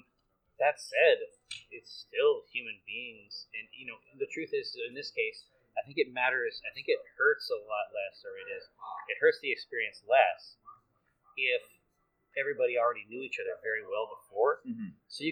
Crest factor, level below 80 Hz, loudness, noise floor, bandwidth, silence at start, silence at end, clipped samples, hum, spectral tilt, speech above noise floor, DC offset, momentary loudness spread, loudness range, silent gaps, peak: 24 dB; -80 dBFS; -32 LUFS; -76 dBFS; 13.5 kHz; 0.6 s; 0 s; under 0.1%; none; -3.5 dB/octave; 44 dB; under 0.1%; 16 LU; 5 LU; none; -10 dBFS